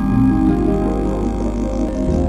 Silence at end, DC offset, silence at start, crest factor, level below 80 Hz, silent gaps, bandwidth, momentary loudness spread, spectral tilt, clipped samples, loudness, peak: 0 s; under 0.1%; 0 s; 12 dB; -24 dBFS; none; 10.5 kHz; 6 LU; -9 dB/octave; under 0.1%; -18 LUFS; -4 dBFS